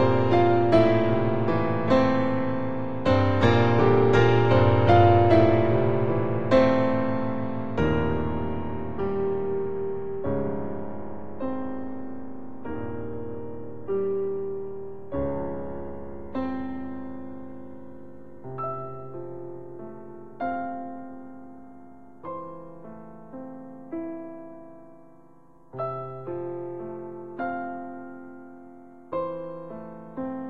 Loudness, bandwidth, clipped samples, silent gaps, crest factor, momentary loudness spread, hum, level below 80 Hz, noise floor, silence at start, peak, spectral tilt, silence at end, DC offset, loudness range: -25 LUFS; 7.4 kHz; under 0.1%; none; 20 dB; 23 LU; none; -48 dBFS; -56 dBFS; 0 s; -6 dBFS; -8.5 dB/octave; 0 s; 1%; 18 LU